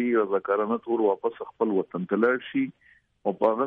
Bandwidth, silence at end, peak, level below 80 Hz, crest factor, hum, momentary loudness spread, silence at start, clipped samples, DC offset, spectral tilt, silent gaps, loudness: 4.1 kHz; 0 s; -10 dBFS; -74 dBFS; 16 dB; none; 8 LU; 0 s; under 0.1%; under 0.1%; -9.5 dB/octave; none; -26 LUFS